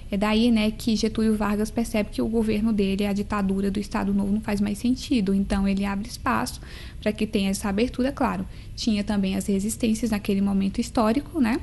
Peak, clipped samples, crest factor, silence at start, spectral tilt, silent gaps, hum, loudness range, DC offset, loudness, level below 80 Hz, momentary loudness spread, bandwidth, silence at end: -10 dBFS; under 0.1%; 14 dB; 0 s; -5.5 dB/octave; none; none; 2 LU; 0.2%; -24 LUFS; -38 dBFS; 4 LU; 12.5 kHz; 0 s